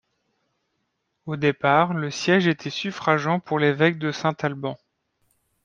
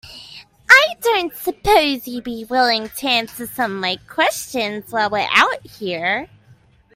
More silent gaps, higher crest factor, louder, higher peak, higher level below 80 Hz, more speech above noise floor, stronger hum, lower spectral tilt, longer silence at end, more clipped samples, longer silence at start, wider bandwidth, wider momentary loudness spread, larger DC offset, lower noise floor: neither; about the same, 22 dB vs 20 dB; second, -22 LUFS vs -17 LUFS; second, -4 dBFS vs 0 dBFS; second, -66 dBFS vs -48 dBFS; first, 53 dB vs 31 dB; neither; first, -6 dB/octave vs -2.5 dB/octave; first, 0.9 s vs 0.7 s; neither; first, 1.25 s vs 0.05 s; second, 9 kHz vs 16 kHz; second, 13 LU vs 16 LU; neither; first, -75 dBFS vs -51 dBFS